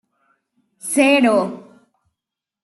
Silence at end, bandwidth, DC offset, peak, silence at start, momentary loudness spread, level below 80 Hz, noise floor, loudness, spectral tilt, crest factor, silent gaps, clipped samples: 1.05 s; 12.5 kHz; under 0.1%; -2 dBFS; 0.85 s; 19 LU; -68 dBFS; -85 dBFS; -16 LUFS; -3.5 dB/octave; 18 dB; none; under 0.1%